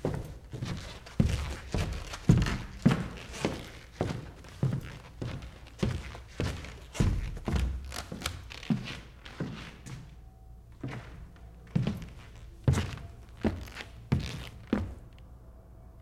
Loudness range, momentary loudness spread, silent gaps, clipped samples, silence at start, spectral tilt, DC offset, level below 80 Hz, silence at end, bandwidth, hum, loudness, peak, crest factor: 9 LU; 20 LU; none; under 0.1%; 0 s; -6.5 dB/octave; under 0.1%; -42 dBFS; 0 s; 15.5 kHz; none; -34 LUFS; -10 dBFS; 24 dB